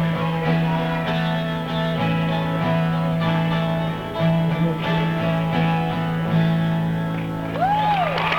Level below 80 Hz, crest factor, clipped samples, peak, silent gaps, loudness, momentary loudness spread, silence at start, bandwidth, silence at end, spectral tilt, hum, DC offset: -44 dBFS; 14 dB; under 0.1%; -8 dBFS; none; -21 LUFS; 4 LU; 0 s; 6.2 kHz; 0 s; -8 dB/octave; none; under 0.1%